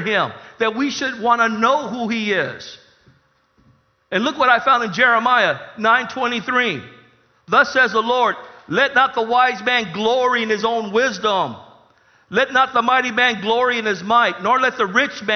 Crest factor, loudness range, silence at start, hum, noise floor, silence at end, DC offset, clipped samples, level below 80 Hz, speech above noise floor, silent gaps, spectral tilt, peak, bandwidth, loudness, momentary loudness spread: 18 dB; 4 LU; 0 s; none; -59 dBFS; 0 s; under 0.1%; under 0.1%; -62 dBFS; 41 dB; none; -3.5 dB/octave; 0 dBFS; 6.6 kHz; -17 LUFS; 7 LU